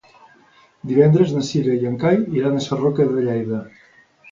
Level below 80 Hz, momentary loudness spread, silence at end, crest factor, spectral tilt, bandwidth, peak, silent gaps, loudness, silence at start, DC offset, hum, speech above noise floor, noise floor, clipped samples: -56 dBFS; 9 LU; 0.65 s; 18 dB; -7.5 dB/octave; 7.6 kHz; -2 dBFS; none; -19 LUFS; 0.85 s; under 0.1%; none; 35 dB; -53 dBFS; under 0.1%